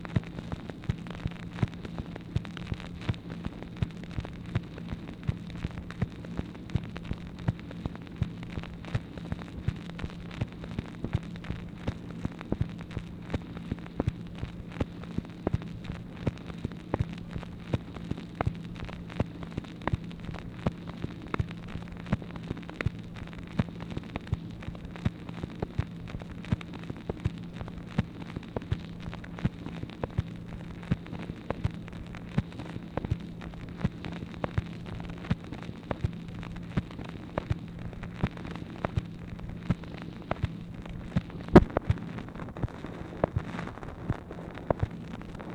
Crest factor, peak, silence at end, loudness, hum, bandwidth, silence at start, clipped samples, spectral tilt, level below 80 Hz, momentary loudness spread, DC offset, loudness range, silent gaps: 34 dB; -2 dBFS; 0 s; -35 LUFS; none; 10 kHz; 0 s; under 0.1%; -8 dB/octave; -44 dBFS; 7 LU; under 0.1%; 8 LU; none